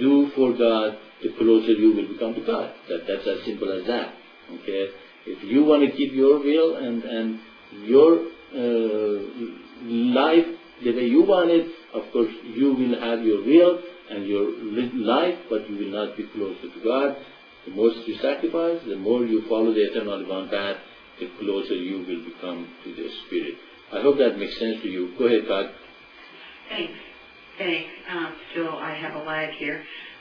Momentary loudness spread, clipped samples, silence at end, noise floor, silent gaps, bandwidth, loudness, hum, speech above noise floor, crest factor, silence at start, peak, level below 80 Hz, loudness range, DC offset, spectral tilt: 17 LU; under 0.1%; 0.05 s; -47 dBFS; none; 5.4 kHz; -23 LUFS; none; 24 dB; 18 dB; 0 s; -4 dBFS; -62 dBFS; 9 LU; under 0.1%; -7.5 dB/octave